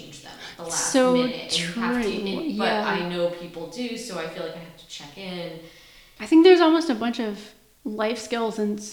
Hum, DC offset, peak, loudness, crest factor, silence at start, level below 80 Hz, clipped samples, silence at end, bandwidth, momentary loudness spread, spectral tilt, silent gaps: none; under 0.1%; -4 dBFS; -23 LUFS; 20 dB; 0 s; -58 dBFS; under 0.1%; 0 s; 19 kHz; 22 LU; -4 dB/octave; none